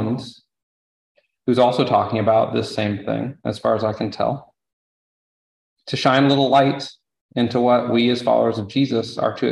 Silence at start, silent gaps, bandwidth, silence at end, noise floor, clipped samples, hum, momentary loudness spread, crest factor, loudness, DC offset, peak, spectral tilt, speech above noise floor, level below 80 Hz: 0 s; 0.63-1.15 s, 4.73-5.76 s, 7.21-7.29 s; 11.5 kHz; 0 s; under -90 dBFS; under 0.1%; none; 12 LU; 18 dB; -19 LUFS; under 0.1%; -2 dBFS; -6.5 dB/octave; over 71 dB; -56 dBFS